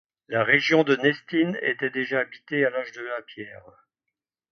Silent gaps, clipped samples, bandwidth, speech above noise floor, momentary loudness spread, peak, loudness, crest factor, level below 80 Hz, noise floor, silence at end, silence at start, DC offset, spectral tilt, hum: none; under 0.1%; 6.6 kHz; 61 dB; 15 LU; -6 dBFS; -24 LUFS; 20 dB; -72 dBFS; -85 dBFS; 0.95 s; 0.3 s; under 0.1%; -5.5 dB/octave; none